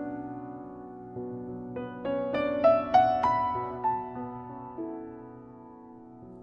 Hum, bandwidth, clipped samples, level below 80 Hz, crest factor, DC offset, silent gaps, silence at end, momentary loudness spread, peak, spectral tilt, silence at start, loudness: none; 6.6 kHz; under 0.1%; -60 dBFS; 22 dB; under 0.1%; none; 0 s; 25 LU; -10 dBFS; -7.5 dB/octave; 0 s; -29 LUFS